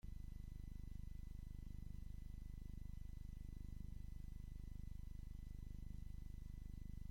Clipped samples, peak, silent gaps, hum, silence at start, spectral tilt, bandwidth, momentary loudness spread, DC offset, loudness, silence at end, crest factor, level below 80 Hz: under 0.1%; -38 dBFS; none; 50 Hz at -55 dBFS; 0.05 s; -7 dB/octave; 16.5 kHz; 1 LU; under 0.1%; -56 LUFS; 0 s; 12 dB; -52 dBFS